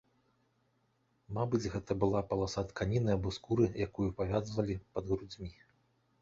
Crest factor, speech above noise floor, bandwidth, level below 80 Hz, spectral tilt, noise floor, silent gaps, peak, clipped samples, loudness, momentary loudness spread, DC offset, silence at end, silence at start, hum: 20 dB; 41 dB; 7.8 kHz; -52 dBFS; -7 dB/octave; -75 dBFS; none; -16 dBFS; under 0.1%; -35 LUFS; 7 LU; under 0.1%; 0.7 s; 1.3 s; none